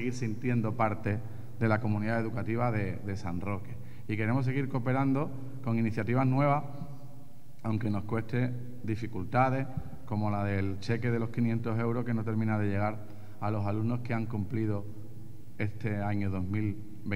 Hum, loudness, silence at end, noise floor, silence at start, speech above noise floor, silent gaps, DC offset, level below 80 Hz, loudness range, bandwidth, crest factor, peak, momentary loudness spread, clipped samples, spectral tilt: none; -32 LUFS; 0 s; -53 dBFS; 0 s; 22 dB; none; 1%; -62 dBFS; 3 LU; 13.5 kHz; 20 dB; -12 dBFS; 12 LU; under 0.1%; -8.5 dB/octave